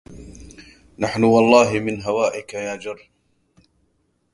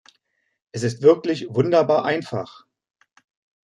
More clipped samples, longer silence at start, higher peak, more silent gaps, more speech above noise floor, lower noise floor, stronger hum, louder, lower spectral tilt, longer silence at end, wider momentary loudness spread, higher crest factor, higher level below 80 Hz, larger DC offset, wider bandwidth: neither; second, 0.1 s vs 0.75 s; first, 0 dBFS vs -4 dBFS; neither; about the same, 48 dB vs 51 dB; second, -66 dBFS vs -71 dBFS; neither; about the same, -19 LUFS vs -20 LUFS; about the same, -5.5 dB/octave vs -6.5 dB/octave; first, 1.35 s vs 1.2 s; first, 23 LU vs 14 LU; about the same, 22 dB vs 20 dB; first, -52 dBFS vs -66 dBFS; neither; about the same, 11.5 kHz vs 11 kHz